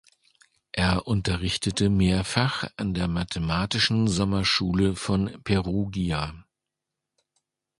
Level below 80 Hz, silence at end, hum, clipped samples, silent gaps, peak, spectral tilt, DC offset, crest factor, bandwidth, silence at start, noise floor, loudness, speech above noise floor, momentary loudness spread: -40 dBFS; 1.4 s; none; under 0.1%; none; -6 dBFS; -5 dB/octave; under 0.1%; 20 dB; 11.5 kHz; 0.75 s; -86 dBFS; -25 LUFS; 61 dB; 6 LU